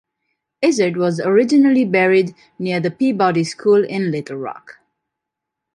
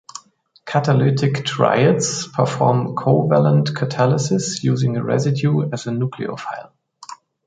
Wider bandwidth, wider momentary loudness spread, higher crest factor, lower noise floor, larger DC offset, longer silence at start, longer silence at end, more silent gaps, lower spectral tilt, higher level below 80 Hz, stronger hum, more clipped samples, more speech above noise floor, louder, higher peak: first, 11.5 kHz vs 9.2 kHz; about the same, 14 LU vs 15 LU; about the same, 16 dB vs 18 dB; first, -82 dBFS vs -52 dBFS; neither; first, 0.6 s vs 0.15 s; first, 1.05 s vs 0.35 s; neither; about the same, -6 dB/octave vs -6 dB/octave; second, -66 dBFS vs -58 dBFS; neither; neither; first, 65 dB vs 35 dB; about the same, -17 LUFS vs -18 LUFS; about the same, -2 dBFS vs 0 dBFS